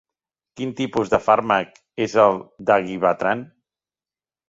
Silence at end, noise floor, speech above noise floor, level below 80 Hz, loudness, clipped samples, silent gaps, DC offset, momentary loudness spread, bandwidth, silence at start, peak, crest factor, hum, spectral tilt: 1.05 s; under -90 dBFS; over 70 dB; -58 dBFS; -20 LUFS; under 0.1%; none; under 0.1%; 11 LU; 7.8 kHz; 0.55 s; -2 dBFS; 20 dB; none; -5.5 dB/octave